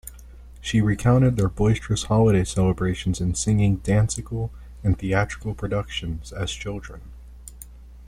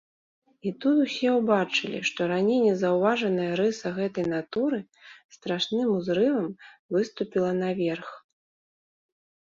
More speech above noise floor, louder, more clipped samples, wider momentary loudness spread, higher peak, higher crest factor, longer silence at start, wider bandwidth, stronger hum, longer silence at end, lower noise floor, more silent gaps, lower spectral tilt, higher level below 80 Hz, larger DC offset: second, 21 dB vs over 64 dB; first, -23 LUFS vs -26 LUFS; neither; first, 23 LU vs 10 LU; first, -4 dBFS vs -8 dBFS; about the same, 18 dB vs 18 dB; second, 0.05 s vs 0.65 s; first, 15 kHz vs 7.6 kHz; neither; second, 0 s vs 1.35 s; second, -43 dBFS vs under -90 dBFS; second, none vs 5.24-5.29 s, 6.79-6.89 s; about the same, -6 dB/octave vs -5.5 dB/octave; first, -38 dBFS vs -70 dBFS; neither